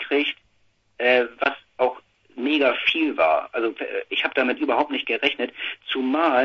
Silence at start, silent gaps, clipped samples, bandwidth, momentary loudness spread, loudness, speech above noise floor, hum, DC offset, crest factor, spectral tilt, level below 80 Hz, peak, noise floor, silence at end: 0 s; none; under 0.1%; 6.6 kHz; 8 LU; -22 LUFS; 43 dB; none; under 0.1%; 22 dB; -4.5 dB/octave; -68 dBFS; -2 dBFS; -65 dBFS; 0 s